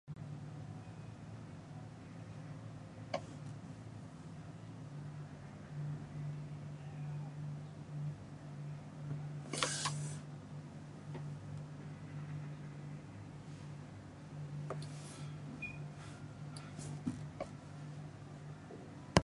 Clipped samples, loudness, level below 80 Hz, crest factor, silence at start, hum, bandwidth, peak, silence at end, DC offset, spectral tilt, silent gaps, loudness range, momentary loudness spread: under 0.1%; -46 LUFS; -64 dBFS; 36 dB; 0.05 s; none; 11.5 kHz; -8 dBFS; 0 s; under 0.1%; -5 dB/octave; none; 6 LU; 8 LU